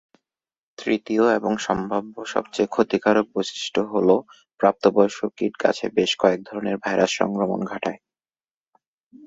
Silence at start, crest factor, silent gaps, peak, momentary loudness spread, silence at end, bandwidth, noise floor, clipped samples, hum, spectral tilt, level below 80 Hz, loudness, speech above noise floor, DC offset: 0.8 s; 20 dB; none; -2 dBFS; 9 LU; 1.3 s; 8 kHz; under -90 dBFS; under 0.1%; none; -5 dB/octave; -62 dBFS; -22 LUFS; over 68 dB; under 0.1%